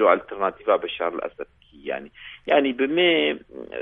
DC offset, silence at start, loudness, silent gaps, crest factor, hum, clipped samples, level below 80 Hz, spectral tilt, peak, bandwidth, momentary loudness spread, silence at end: under 0.1%; 0 s; -23 LUFS; none; 20 dB; none; under 0.1%; -60 dBFS; -7.5 dB/octave; -4 dBFS; 4 kHz; 19 LU; 0 s